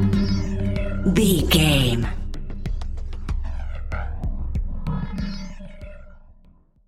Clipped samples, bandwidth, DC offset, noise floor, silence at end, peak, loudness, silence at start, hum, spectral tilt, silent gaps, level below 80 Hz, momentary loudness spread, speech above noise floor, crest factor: under 0.1%; 16 kHz; under 0.1%; -52 dBFS; 0.55 s; -4 dBFS; -24 LUFS; 0 s; none; -5.5 dB/octave; none; -28 dBFS; 18 LU; 35 dB; 20 dB